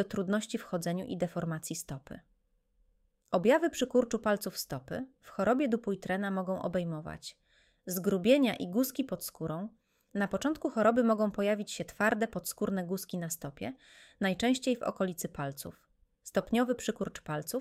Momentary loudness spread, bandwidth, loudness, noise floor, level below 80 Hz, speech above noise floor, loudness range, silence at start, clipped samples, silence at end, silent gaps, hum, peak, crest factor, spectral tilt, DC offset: 14 LU; 16 kHz; -32 LUFS; -72 dBFS; -64 dBFS; 40 dB; 4 LU; 0 s; under 0.1%; 0 s; none; none; -12 dBFS; 20 dB; -5 dB/octave; under 0.1%